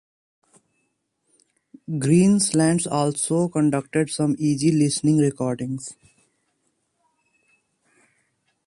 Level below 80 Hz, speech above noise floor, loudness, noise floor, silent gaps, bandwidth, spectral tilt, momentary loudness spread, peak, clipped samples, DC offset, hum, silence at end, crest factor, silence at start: -62 dBFS; 52 dB; -21 LUFS; -73 dBFS; none; 11.5 kHz; -5.5 dB/octave; 12 LU; -6 dBFS; under 0.1%; under 0.1%; none; 2.75 s; 18 dB; 1.9 s